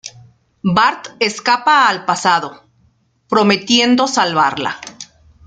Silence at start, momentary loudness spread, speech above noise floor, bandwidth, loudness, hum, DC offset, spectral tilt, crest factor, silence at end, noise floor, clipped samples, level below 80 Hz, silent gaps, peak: 0.05 s; 18 LU; 43 dB; 9.4 kHz; -14 LUFS; none; under 0.1%; -3.5 dB/octave; 16 dB; 0.4 s; -57 dBFS; under 0.1%; -56 dBFS; none; 0 dBFS